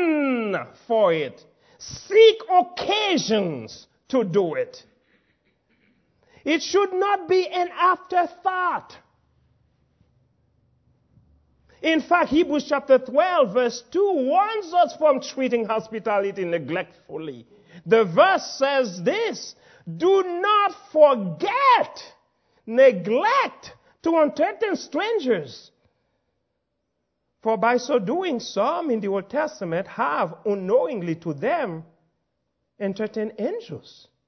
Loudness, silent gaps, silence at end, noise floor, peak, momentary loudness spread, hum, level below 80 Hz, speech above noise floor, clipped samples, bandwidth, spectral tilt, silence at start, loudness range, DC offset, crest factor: -22 LUFS; none; 0.5 s; -77 dBFS; -4 dBFS; 14 LU; none; -66 dBFS; 55 dB; under 0.1%; 6.4 kHz; -5 dB/octave; 0 s; 7 LU; under 0.1%; 20 dB